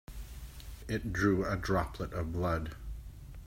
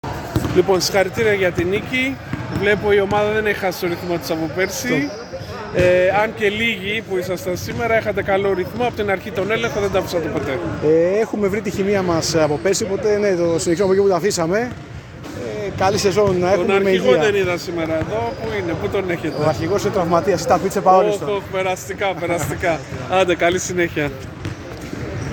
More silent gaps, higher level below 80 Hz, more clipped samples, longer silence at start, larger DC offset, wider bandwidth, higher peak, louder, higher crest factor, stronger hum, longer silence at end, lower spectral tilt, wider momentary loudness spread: neither; about the same, -46 dBFS vs -42 dBFS; neither; about the same, 0.1 s vs 0.05 s; neither; second, 16 kHz vs 18 kHz; second, -16 dBFS vs -2 dBFS; second, -34 LUFS vs -19 LUFS; about the same, 18 dB vs 18 dB; neither; about the same, 0 s vs 0 s; first, -6.5 dB/octave vs -5 dB/octave; first, 18 LU vs 9 LU